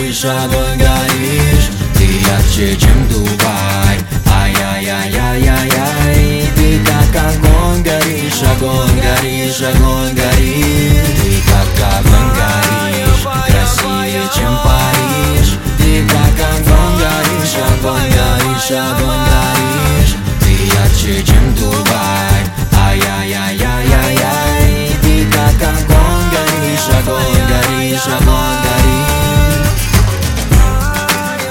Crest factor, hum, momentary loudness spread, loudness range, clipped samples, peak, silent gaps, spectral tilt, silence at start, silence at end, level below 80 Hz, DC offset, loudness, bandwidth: 10 dB; none; 3 LU; 1 LU; under 0.1%; 0 dBFS; none; -4.5 dB/octave; 0 s; 0 s; -14 dBFS; under 0.1%; -11 LUFS; 17 kHz